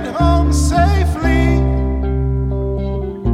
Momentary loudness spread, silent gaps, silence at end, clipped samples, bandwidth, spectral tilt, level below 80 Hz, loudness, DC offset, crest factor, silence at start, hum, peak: 7 LU; none; 0 s; under 0.1%; 12.5 kHz; -7 dB/octave; -18 dBFS; -16 LUFS; under 0.1%; 12 dB; 0 s; none; -2 dBFS